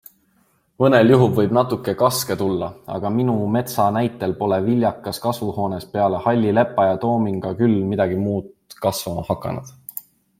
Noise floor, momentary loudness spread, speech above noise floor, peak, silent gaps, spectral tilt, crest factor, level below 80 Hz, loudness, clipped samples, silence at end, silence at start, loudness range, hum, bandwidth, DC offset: -62 dBFS; 10 LU; 43 dB; -2 dBFS; none; -6.5 dB/octave; 18 dB; -54 dBFS; -20 LUFS; under 0.1%; 0.4 s; 0.8 s; 3 LU; none; 16.5 kHz; under 0.1%